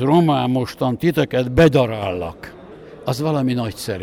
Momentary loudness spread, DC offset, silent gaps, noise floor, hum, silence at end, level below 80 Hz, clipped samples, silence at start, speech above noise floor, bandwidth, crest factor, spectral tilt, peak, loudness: 15 LU; under 0.1%; none; -39 dBFS; none; 0 s; -40 dBFS; under 0.1%; 0 s; 21 dB; 16.5 kHz; 14 dB; -7 dB/octave; -4 dBFS; -19 LUFS